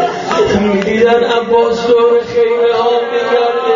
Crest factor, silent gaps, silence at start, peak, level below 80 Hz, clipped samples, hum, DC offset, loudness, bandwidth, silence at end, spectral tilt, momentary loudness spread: 12 dB; none; 0 s; 0 dBFS; -44 dBFS; under 0.1%; none; under 0.1%; -11 LUFS; 7.6 kHz; 0 s; -3.5 dB/octave; 3 LU